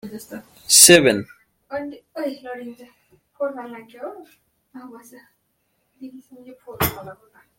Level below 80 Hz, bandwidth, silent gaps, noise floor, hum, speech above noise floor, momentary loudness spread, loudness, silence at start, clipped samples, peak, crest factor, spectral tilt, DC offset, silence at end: -56 dBFS; 16.5 kHz; none; -70 dBFS; none; 49 dB; 28 LU; -15 LUFS; 0.05 s; under 0.1%; 0 dBFS; 22 dB; -2 dB/octave; under 0.1%; 0.45 s